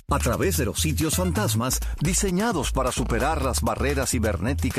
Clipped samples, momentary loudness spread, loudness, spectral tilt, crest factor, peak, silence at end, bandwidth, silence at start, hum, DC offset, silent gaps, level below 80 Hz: under 0.1%; 2 LU; -24 LUFS; -4.5 dB/octave; 14 dB; -10 dBFS; 0 s; 14.5 kHz; 0.1 s; none; under 0.1%; none; -32 dBFS